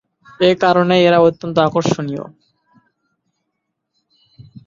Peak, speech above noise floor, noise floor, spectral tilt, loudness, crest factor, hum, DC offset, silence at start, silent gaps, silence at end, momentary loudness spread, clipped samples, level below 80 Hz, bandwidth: -2 dBFS; 61 dB; -75 dBFS; -6 dB/octave; -14 LUFS; 16 dB; none; under 0.1%; 0.4 s; none; 0.25 s; 13 LU; under 0.1%; -56 dBFS; 7.6 kHz